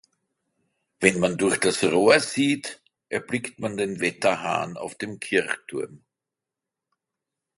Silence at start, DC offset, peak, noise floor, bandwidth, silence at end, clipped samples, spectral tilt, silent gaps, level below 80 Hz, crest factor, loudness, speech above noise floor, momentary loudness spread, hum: 1 s; under 0.1%; -2 dBFS; -87 dBFS; 11.5 kHz; 1.6 s; under 0.1%; -4 dB/octave; none; -64 dBFS; 24 dB; -24 LUFS; 64 dB; 14 LU; none